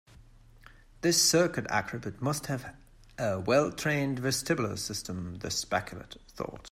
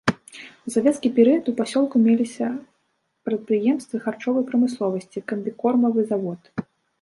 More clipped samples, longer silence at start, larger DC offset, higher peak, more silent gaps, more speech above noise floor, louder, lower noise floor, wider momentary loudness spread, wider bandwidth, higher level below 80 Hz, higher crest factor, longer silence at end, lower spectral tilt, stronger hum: neither; about the same, 0.15 s vs 0.05 s; neither; second, -12 dBFS vs -2 dBFS; neither; second, 25 dB vs 50 dB; second, -30 LUFS vs -22 LUFS; second, -55 dBFS vs -71 dBFS; about the same, 17 LU vs 16 LU; first, 16 kHz vs 11.5 kHz; first, -56 dBFS vs -64 dBFS; about the same, 20 dB vs 20 dB; second, 0.05 s vs 0.4 s; second, -3.5 dB/octave vs -6 dB/octave; neither